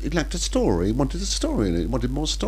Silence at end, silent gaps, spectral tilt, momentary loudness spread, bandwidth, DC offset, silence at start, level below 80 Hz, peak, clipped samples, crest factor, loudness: 0 s; none; -5 dB/octave; 3 LU; 15 kHz; under 0.1%; 0 s; -28 dBFS; -6 dBFS; under 0.1%; 16 dB; -24 LUFS